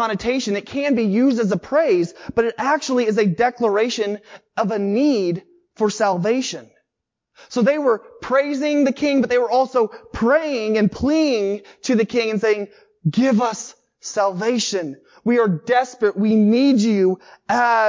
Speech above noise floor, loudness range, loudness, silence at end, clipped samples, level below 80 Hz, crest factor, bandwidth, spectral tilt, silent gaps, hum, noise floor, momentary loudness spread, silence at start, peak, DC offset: 62 dB; 3 LU; -19 LUFS; 0 s; under 0.1%; -52 dBFS; 14 dB; 7.6 kHz; -5.5 dB/octave; none; none; -81 dBFS; 9 LU; 0 s; -6 dBFS; under 0.1%